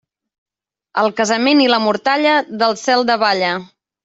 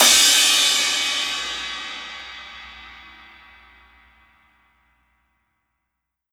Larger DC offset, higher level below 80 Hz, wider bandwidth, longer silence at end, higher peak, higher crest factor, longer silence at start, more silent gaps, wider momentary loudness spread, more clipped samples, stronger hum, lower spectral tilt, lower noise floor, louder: neither; second, -64 dBFS vs -58 dBFS; second, 8 kHz vs over 20 kHz; second, 0.4 s vs 3.3 s; about the same, -2 dBFS vs 0 dBFS; second, 14 dB vs 24 dB; first, 0.95 s vs 0 s; neither; second, 6 LU vs 26 LU; neither; neither; first, -3.5 dB/octave vs 2.5 dB/octave; second, -47 dBFS vs -80 dBFS; about the same, -15 LUFS vs -16 LUFS